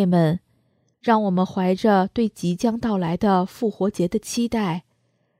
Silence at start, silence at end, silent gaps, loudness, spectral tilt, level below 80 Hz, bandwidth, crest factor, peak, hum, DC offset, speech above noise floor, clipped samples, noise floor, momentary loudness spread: 0 s; 0.6 s; none; -22 LUFS; -6.5 dB/octave; -54 dBFS; 15 kHz; 18 dB; -4 dBFS; none; under 0.1%; 46 dB; under 0.1%; -67 dBFS; 7 LU